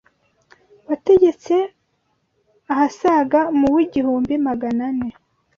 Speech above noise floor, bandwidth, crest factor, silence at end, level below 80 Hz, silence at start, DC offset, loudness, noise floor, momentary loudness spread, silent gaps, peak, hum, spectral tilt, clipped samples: 51 dB; 7.2 kHz; 16 dB; 0.5 s; -54 dBFS; 0.9 s; under 0.1%; -18 LUFS; -68 dBFS; 10 LU; none; -4 dBFS; none; -6.5 dB/octave; under 0.1%